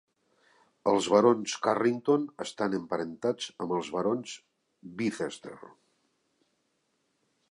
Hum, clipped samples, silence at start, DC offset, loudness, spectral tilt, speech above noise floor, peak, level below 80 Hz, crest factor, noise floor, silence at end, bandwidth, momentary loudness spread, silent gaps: none; under 0.1%; 0.85 s; under 0.1%; -29 LUFS; -5 dB/octave; 47 dB; -8 dBFS; -74 dBFS; 22 dB; -76 dBFS; 1.8 s; 11.5 kHz; 20 LU; none